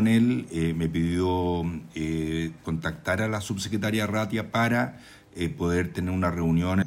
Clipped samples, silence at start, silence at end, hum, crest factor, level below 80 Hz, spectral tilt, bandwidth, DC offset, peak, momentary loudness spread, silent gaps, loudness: under 0.1%; 0 s; 0 s; none; 14 dB; -46 dBFS; -6.5 dB/octave; 16 kHz; under 0.1%; -12 dBFS; 7 LU; none; -27 LUFS